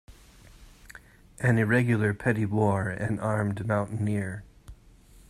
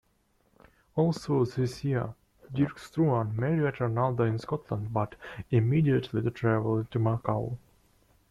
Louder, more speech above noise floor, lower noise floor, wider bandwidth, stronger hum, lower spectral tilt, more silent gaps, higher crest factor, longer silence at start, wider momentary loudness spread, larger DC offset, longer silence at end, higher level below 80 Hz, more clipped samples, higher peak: about the same, -27 LUFS vs -29 LUFS; second, 28 dB vs 42 dB; second, -54 dBFS vs -70 dBFS; first, 13 kHz vs 11.5 kHz; neither; about the same, -8 dB/octave vs -8.5 dB/octave; neither; about the same, 20 dB vs 18 dB; second, 0.1 s vs 0.95 s; about the same, 8 LU vs 8 LU; neither; second, 0.55 s vs 0.75 s; about the same, -54 dBFS vs -58 dBFS; neither; first, -8 dBFS vs -12 dBFS